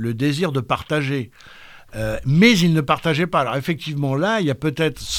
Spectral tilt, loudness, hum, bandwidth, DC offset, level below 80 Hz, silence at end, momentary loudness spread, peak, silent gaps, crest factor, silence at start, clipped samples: -5.5 dB/octave; -19 LUFS; none; 17.5 kHz; under 0.1%; -44 dBFS; 0 s; 12 LU; -2 dBFS; none; 18 dB; 0 s; under 0.1%